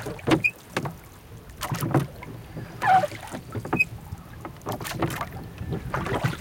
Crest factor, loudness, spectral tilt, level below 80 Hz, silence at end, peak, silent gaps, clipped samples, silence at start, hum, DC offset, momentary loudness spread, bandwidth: 20 dB; -27 LUFS; -5.5 dB/octave; -48 dBFS; 0 s; -8 dBFS; none; under 0.1%; 0 s; none; under 0.1%; 18 LU; 17 kHz